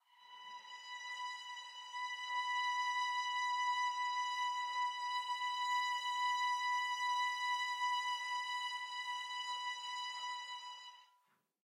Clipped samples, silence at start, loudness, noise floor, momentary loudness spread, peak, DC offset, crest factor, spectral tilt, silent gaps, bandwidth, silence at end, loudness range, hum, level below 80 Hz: under 0.1%; 0.2 s; -38 LUFS; -77 dBFS; 12 LU; -28 dBFS; under 0.1%; 12 dB; 6.5 dB/octave; none; 13.5 kHz; 0.6 s; 4 LU; none; under -90 dBFS